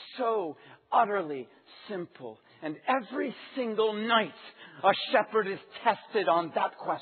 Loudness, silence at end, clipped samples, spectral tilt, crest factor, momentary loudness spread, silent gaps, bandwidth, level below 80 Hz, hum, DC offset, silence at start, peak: -29 LUFS; 0 s; under 0.1%; -1.5 dB/octave; 22 dB; 16 LU; none; 4.5 kHz; -88 dBFS; none; under 0.1%; 0 s; -10 dBFS